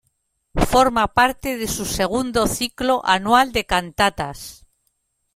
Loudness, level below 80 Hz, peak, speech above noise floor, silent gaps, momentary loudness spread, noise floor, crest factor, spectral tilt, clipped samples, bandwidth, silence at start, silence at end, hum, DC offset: -19 LUFS; -36 dBFS; -2 dBFS; 51 dB; none; 12 LU; -70 dBFS; 18 dB; -3.5 dB/octave; under 0.1%; 16.5 kHz; 0.55 s; 0.8 s; none; under 0.1%